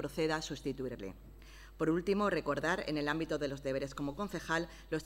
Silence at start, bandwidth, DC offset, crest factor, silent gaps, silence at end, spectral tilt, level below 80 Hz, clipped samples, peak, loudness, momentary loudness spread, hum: 0 s; 16 kHz; under 0.1%; 16 dB; none; 0 s; -5.5 dB/octave; -54 dBFS; under 0.1%; -20 dBFS; -36 LUFS; 15 LU; none